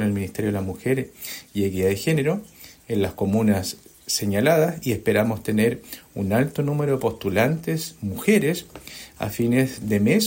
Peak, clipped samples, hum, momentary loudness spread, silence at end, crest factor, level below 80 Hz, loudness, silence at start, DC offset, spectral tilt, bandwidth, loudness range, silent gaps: -6 dBFS; under 0.1%; none; 12 LU; 0 s; 16 dB; -54 dBFS; -23 LUFS; 0 s; under 0.1%; -5.5 dB/octave; 16.5 kHz; 2 LU; none